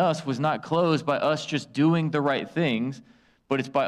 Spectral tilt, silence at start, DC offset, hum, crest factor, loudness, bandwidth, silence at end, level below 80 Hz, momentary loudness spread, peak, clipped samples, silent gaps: -6.5 dB/octave; 0 s; under 0.1%; none; 12 dB; -25 LUFS; 10.5 kHz; 0 s; -68 dBFS; 7 LU; -12 dBFS; under 0.1%; none